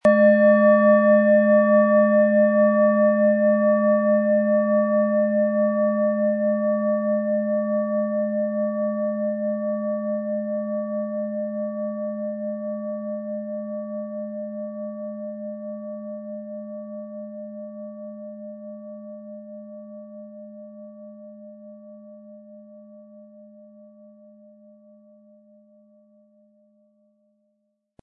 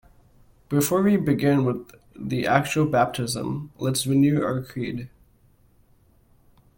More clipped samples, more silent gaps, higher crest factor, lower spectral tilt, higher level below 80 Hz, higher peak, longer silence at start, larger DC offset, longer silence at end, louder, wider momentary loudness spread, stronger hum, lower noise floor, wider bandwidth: neither; neither; about the same, 16 dB vs 20 dB; first, -10 dB/octave vs -5.5 dB/octave; second, -76 dBFS vs -56 dBFS; about the same, -6 dBFS vs -4 dBFS; second, 0.05 s vs 0.7 s; neither; first, 4.6 s vs 1.7 s; about the same, -21 LUFS vs -23 LUFS; first, 23 LU vs 11 LU; neither; first, -74 dBFS vs -59 dBFS; second, 3.6 kHz vs 17 kHz